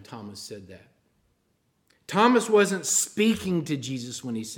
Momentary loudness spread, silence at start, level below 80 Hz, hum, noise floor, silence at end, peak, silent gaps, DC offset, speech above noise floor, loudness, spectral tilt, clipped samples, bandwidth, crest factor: 19 LU; 0 s; -64 dBFS; none; -71 dBFS; 0 s; -8 dBFS; none; under 0.1%; 46 dB; -24 LUFS; -3.5 dB/octave; under 0.1%; 17 kHz; 20 dB